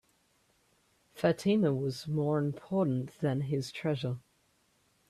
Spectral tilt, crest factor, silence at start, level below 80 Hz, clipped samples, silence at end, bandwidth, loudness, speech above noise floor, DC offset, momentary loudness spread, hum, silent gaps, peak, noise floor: -7.5 dB/octave; 18 dB; 1.15 s; -70 dBFS; under 0.1%; 0.9 s; 13.5 kHz; -32 LUFS; 41 dB; under 0.1%; 7 LU; none; none; -14 dBFS; -71 dBFS